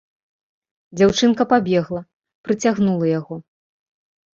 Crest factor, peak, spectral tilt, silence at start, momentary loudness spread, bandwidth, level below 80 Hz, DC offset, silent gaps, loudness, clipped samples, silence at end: 20 dB; -2 dBFS; -5.5 dB/octave; 0.95 s; 19 LU; 7.8 kHz; -54 dBFS; under 0.1%; 2.13-2.20 s, 2.35-2.44 s; -18 LUFS; under 0.1%; 0.95 s